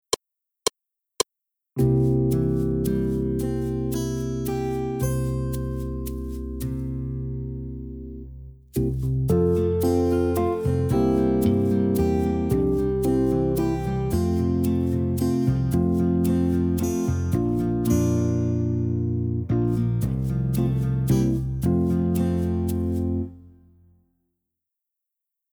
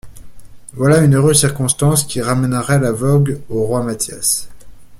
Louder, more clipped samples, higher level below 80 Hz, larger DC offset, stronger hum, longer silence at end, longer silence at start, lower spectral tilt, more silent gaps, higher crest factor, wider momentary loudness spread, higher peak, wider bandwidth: second, -24 LUFS vs -15 LUFS; neither; first, -36 dBFS vs -42 dBFS; neither; neither; first, 2 s vs 0.05 s; about the same, 0.1 s vs 0.05 s; first, -7.5 dB/octave vs -5 dB/octave; neither; about the same, 16 dB vs 16 dB; about the same, 9 LU vs 8 LU; second, -6 dBFS vs 0 dBFS; first, over 20 kHz vs 16 kHz